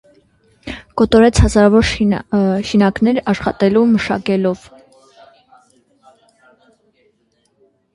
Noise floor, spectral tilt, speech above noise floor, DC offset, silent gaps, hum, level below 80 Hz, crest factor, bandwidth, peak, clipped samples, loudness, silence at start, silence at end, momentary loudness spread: -62 dBFS; -6 dB/octave; 49 dB; under 0.1%; none; none; -30 dBFS; 16 dB; 11.5 kHz; 0 dBFS; under 0.1%; -14 LUFS; 0.65 s; 3.4 s; 15 LU